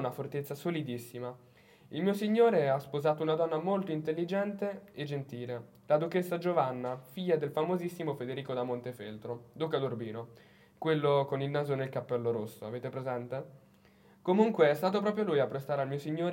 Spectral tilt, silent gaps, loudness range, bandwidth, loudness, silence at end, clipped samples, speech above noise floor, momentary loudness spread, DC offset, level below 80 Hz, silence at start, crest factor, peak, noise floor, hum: -7 dB/octave; none; 4 LU; 16.5 kHz; -33 LUFS; 0 s; under 0.1%; 30 dB; 14 LU; under 0.1%; -80 dBFS; 0 s; 20 dB; -12 dBFS; -62 dBFS; none